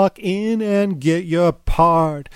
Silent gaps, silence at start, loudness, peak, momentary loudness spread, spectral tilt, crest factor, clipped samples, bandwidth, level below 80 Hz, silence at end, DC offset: none; 0 s; -18 LUFS; -2 dBFS; 5 LU; -7 dB/octave; 14 dB; under 0.1%; 13.5 kHz; -30 dBFS; 0.1 s; under 0.1%